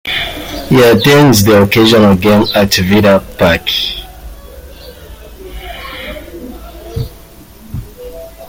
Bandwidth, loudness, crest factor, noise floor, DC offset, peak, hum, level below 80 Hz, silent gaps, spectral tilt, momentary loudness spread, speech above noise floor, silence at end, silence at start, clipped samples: 17 kHz; -9 LUFS; 12 dB; -36 dBFS; under 0.1%; 0 dBFS; none; -32 dBFS; none; -5 dB/octave; 23 LU; 28 dB; 0 s; 0.05 s; under 0.1%